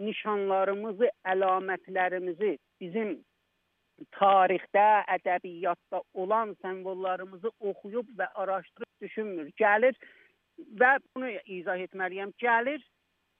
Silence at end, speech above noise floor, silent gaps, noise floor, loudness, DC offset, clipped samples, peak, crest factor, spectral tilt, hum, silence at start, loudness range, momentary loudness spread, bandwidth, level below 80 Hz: 0.6 s; 48 dB; none; -76 dBFS; -29 LUFS; under 0.1%; under 0.1%; -10 dBFS; 20 dB; -8 dB/octave; none; 0 s; 6 LU; 14 LU; 3.9 kHz; -88 dBFS